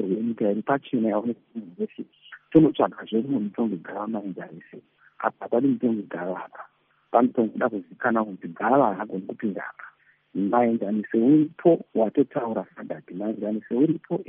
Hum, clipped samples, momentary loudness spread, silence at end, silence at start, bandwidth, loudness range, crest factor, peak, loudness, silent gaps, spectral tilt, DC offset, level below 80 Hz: none; under 0.1%; 16 LU; 0.05 s; 0 s; 3.7 kHz; 4 LU; 20 dB; -4 dBFS; -25 LUFS; none; -7 dB/octave; under 0.1%; -66 dBFS